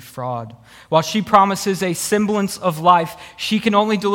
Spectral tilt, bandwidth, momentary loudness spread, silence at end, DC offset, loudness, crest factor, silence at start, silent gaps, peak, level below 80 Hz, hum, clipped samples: -4.5 dB/octave; 18 kHz; 12 LU; 0 s; under 0.1%; -18 LUFS; 18 dB; 0 s; none; 0 dBFS; -56 dBFS; none; under 0.1%